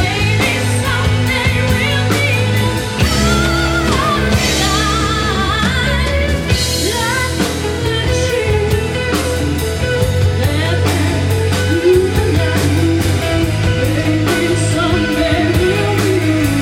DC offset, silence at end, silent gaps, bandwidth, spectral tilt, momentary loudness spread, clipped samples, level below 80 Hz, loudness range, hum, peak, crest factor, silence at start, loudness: under 0.1%; 0 s; none; 16.5 kHz; -5 dB/octave; 3 LU; under 0.1%; -24 dBFS; 2 LU; none; 0 dBFS; 14 dB; 0 s; -14 LUFS